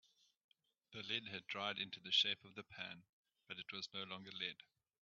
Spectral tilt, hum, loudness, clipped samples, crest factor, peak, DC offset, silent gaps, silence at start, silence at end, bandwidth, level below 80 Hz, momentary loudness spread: 0.5 dB/octave; none; -43 LUFS; under 0.1%; 24 dB; -24 dBFS; under 0.1%; 3.09-3.23 s; 0.9 s; 0.5 s; 7.2 kHz; -90 dBFS; 18 LU